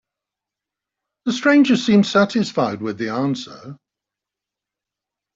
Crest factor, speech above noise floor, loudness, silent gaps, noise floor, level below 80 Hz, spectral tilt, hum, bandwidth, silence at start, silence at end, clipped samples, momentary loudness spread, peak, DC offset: 18 dB; 69 dB; -18 LUFS; none; -86 dBFS; -64 dBFS; -5.5 dB/octave; none; 7.8 kHz; 1.25 s; 1.6 s; under 0.1%; 14 LU; -4 dBFS; under 0.1%